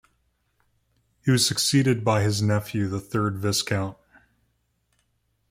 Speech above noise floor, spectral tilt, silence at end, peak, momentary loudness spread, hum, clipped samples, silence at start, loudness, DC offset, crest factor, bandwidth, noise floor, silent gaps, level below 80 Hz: 48 dB; -4.5 dB/octave; 1.55 s; -8 dBFS; 8 LU; none; under 0.1%; 1.25 s; -23 LUFS; under 0.1%; 18 dB; 16.5 kHz; -71 dBFS; none; -58 dBFS